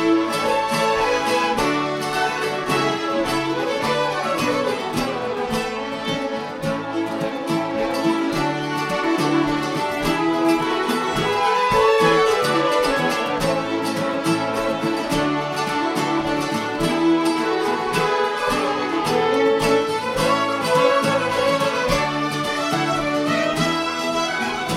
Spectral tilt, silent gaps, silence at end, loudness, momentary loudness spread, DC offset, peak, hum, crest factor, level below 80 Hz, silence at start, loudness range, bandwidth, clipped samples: -4.5 dB/octave; none; 0 s; -20 LUFS; 6 LU; under 0.1%; -4 dBFS; none; 16 dB; -46 dBFS; 0 s; 4 LU; 16 kHz; under 0.1%